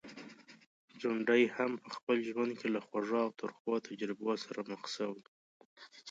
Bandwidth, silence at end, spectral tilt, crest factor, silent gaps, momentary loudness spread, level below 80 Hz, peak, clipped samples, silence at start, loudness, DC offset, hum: 7.8 kHz; 0 s; -5 dB/octave; 20 dB; 0.66-0.88 s, 2.03-2.07 s, 3.60-3.65 s, 5.28-5.76 s; 21 LU; -88 dBFS; -16 dBFS; under 0.1%; 0.05 s; -36 LUFS; under 0.1%; none